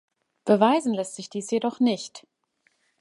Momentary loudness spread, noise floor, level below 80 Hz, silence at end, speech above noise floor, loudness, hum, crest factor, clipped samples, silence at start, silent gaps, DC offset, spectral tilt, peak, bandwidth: 14 LU; -70 dBFS; -76 dBFS; 0.8 s; 46 dB; -24 LUFS; none; 22 dB; under 0.1%; 0.45 s; none; under 0.1%; -5 dB/octave; -4 dBFS; 11.5 kHz